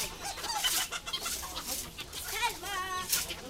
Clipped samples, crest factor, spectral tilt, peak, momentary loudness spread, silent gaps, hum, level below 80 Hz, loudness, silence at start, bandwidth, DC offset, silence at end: under 0.1%; 22 dB; 0 dB/octave; -14 dBFS; 8 LU; none; none; -52 dBFS; -33 LUFS; 0 s; 16 kHz; under 0.1%; 0 s